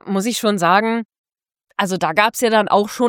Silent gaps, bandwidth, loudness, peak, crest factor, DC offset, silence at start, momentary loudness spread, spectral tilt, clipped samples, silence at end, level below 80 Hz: 1.05-1.09 s, 1.18-1.24 s; 17.5 kHz; -17 LUFS; 0 dBFS; 18 dB; under 0.1%; 0.05 s; 10 LU; -4 dB/octave; under 0.1%; 0 s; -64 dBFS